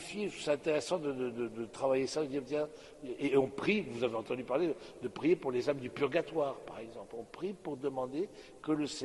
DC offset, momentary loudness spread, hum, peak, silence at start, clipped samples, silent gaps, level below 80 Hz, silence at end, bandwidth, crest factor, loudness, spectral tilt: under 0.1%; 12 LU; none; -18 dBFS; 0 s; under 0.1%; none; -68 dBFS; 0 s; 11.5 kHz; 18 dB; -35 LUFS; -5.5 dB/octave